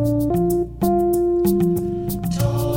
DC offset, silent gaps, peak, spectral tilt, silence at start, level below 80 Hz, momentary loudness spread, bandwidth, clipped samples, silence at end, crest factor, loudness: under 0.1%; none; -6 dBFS; -8 dB/octave; 0 s; -36 dBFS; 6 LU; 17 kHz; under 0.1%; 0 s; 12 dB; -20 LUFS